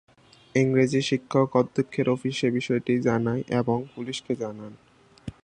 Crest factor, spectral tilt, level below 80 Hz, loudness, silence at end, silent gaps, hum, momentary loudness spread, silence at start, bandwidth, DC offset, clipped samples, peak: 18 dB; -6.5 dB/octave; -60 dBFS; -25 LUFS; 0.1 s; none; none; 12 LU; 0.55 s; 9.8 kHz; under 0.1%; under 0.1%; -6 dBFS